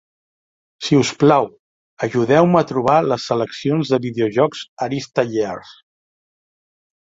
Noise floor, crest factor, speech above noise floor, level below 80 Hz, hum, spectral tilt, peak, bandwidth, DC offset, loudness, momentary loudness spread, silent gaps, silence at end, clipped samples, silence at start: under -90 dBFS; 18 dB; over 73 dB; -58 dBFS; none; -6 dB/octave; -2 dBFS; 7.8 kHz; under 0.1%; -18 LUFS; 12 LU; 1.59-1.97 s, 4.69-4.77 s; 1.3 s; under 0.1%; 0.8 s